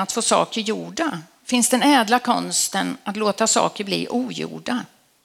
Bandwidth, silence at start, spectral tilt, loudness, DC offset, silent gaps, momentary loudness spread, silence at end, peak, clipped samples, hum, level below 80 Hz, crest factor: 16.5 kHz; 0 s; -2.5 dB/octave; -20 LUFS; under 0.1%; none; 11 LU; 0.4 s; -2 dBFS; under 0.1%; none; -68 dBFS; 20 dB